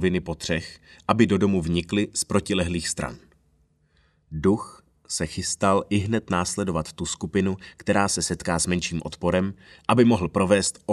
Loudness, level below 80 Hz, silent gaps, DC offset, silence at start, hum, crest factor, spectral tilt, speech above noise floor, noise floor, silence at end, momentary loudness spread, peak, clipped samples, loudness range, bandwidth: -24 LUFS; -46 dBFS; none; under 0.1%; 0 s; none; 22 dB; -4.5 dB/octave; 40 dB; -64 dBFS; 0 s; 10 LU; -2 dBFS; under 0.1%; 4 LU; 13 kHz